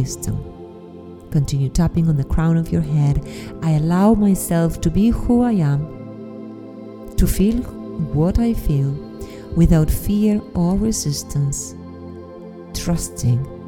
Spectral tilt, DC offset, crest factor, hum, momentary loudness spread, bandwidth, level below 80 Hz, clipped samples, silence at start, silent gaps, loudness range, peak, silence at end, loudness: -7 dB/octave; under 0.1%; 18 dB; none; 19 LU; 17.5 kHz; -28 dBFS; under 0.1%; 0 s; none; 4 LU; -2 dBFS; 0 s; -19 LUFS